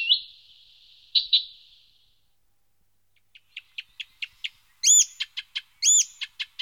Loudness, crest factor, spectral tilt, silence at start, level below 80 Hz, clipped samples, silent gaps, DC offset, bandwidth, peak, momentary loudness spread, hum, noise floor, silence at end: -21 LUFS; 20 dB; 8 dB/octave; 0 s; -74 dBFS; under 0.1%; none; under 0.1%; over 20 kHz; -8 dBFS; 23 LU; none; -74 dBFS; 0.15 s